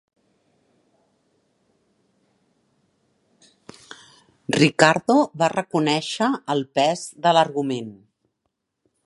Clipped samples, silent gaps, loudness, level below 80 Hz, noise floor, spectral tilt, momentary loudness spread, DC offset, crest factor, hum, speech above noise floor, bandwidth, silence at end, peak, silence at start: under 0.1%; none; -20 LUFS; -70 dBFS; -77 dBFS; -4.5 dB/octave; 22 LU; under 0.1%; 24 dB; none; 57 dB; 11.5 kHz; 1.15 s; 0 dBFS; 4.5 s